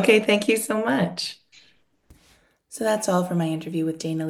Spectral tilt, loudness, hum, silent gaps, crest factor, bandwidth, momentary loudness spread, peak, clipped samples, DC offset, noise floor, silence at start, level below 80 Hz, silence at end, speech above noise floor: -4.5 dB/octave; -23 LUFS; none; none; 20 dB; 16 kHz; 12 LU; -4 dBFS; under 0.1%; under 0.1%; -60 dBFS; 0 s; -64 dBFS; 0 s; 38 dB